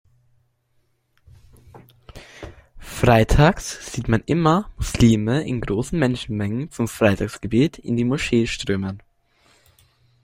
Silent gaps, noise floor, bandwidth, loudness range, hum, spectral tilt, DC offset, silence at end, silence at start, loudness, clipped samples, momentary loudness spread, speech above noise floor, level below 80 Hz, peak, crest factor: none; -66 dBFS; 16 kHz; 4 LU; none; -6 dB/octave; under 0.1%; 1.25 s; 1.75 s; -20 LUFS; under 0.1%; 13 LU; 46 dB; -34 dBFS; 0 dBFS; 20 dB